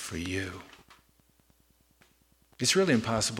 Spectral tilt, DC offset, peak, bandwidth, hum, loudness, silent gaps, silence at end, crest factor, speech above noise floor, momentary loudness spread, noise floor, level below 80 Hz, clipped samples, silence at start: -3.5 dB/octave; under 0.1%; -12 dBFS; 17.5 kHz; none; -28 LUFS; none; 0 s; 20 dB; 38 dB; 15 LU; -67 dBFS; -58 dBFS; under 0.1%; 0 s